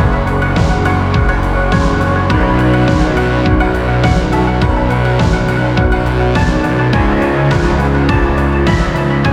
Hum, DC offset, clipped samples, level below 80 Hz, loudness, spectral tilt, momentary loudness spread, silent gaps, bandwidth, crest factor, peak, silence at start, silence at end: none; under 0.1%; under 0.1%; -18 dBFS; -13 LUFS; -7 dB/octave; 2 LU; none; 11.5 kHz; 12 dB; 0 dBFS; 0 s; 0 s